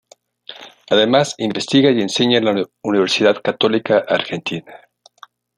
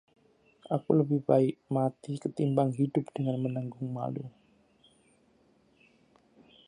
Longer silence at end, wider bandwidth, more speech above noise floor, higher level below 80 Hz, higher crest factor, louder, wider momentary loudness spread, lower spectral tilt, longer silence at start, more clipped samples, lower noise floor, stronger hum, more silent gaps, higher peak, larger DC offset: second, 0.8 s vs 2.4 s; about the same, 11 kHz vs 10.5 kHz; second, 30 dB vs 37 dB; first, -62 dBFS vs -74 dBFS; second, 16 dB vs 22 dB; first, -16 LUFS vs -30 LUFS; first, 15 LU vs 11 LU; second, -4.5 dB/octave vs -9.5 dB/octave; second, 0.5 s vs 0.7 s; neither; second, -47 dBFS vs -66 dBFS; neither; neither; first, -2 dBFS vs -10 dBFS; neither